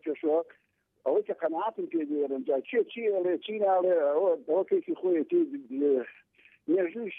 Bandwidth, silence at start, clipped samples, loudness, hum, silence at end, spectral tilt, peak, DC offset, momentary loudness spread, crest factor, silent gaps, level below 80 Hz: 3.8 kHz; 0.05 s; under 0.1%; -29 LUFS; none; 0 s; -8.5 dB/octave; -16 dBFS; under 0.1%; 7 LU; 12 dB; none; -86 dBFS